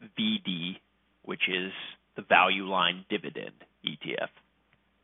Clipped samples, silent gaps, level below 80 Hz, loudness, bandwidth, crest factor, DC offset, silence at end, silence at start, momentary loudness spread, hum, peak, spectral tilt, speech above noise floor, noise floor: under 0.1%; none; -78 dBFS; -28 LUFS; 4 kHz; 26 dB; under 0.1%; 0.75 s; 0 s; 19 LU; none; -6 dBFS; -8 dB/octave; 40 dB; -69 dBFS